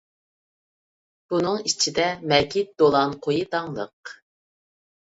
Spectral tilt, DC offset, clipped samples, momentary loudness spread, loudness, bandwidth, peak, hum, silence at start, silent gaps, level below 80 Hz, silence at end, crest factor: -3.5 dB/octave; under 0.1%; under 0.1%; 14 LU; -22 LUFS; 8 kHz; -4 dBFS; none; 1.3 s; 3.93-4.03 s; -58 dBFS; 0.95 s; 22 dB